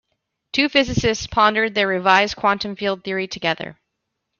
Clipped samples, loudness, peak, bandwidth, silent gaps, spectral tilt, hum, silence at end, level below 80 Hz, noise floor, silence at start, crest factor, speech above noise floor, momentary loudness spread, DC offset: under 0.1%; -19 LUFS; -2 dBFS; 7.2 kHz; none; -4 dB/octave; none; 0.65 s; -46 dBFS; -77 dBFS; 0.55 s; 18 dB; 58 dB; 9 LU; under 0.1%